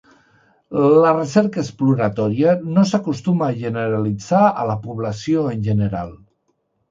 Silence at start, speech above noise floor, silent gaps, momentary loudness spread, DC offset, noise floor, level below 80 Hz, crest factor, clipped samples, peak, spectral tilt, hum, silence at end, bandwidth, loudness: 0.7 s; 50 dB; none; 10 LU; under 0.1%; -68 dBFS; -50 dBFS; 18 dB; under 0.1%; 0 dBFS; -7.5 dB/octave; none; 0.75 s; 7.8 kHz; -18 LUFS